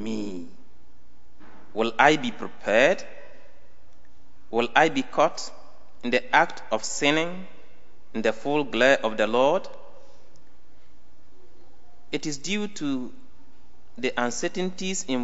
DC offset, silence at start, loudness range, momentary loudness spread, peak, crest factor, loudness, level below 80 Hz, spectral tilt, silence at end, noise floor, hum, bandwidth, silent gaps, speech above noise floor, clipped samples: 3%; 0 s; 10 LU; 16 LU; -2 dBFS; 26 dB; -24 LUFS; -62 dBFS; -3.5 dB/octave; 0 s; -59 dBFS; none; 8.2 kHz; none; 35 dB; under 0.1%